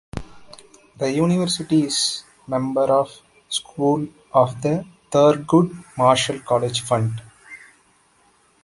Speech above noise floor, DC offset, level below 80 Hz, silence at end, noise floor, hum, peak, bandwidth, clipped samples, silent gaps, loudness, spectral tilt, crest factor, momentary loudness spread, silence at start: 39 dB; under 0.1%; -52 dBFS; 1.1 s; -58 dBFS; none; -2 dBFS; 11.5 kHz; under 0.1%; none; -20 LUFS; -5 dB/octave; 20 dB; 15 LU; 0.15 s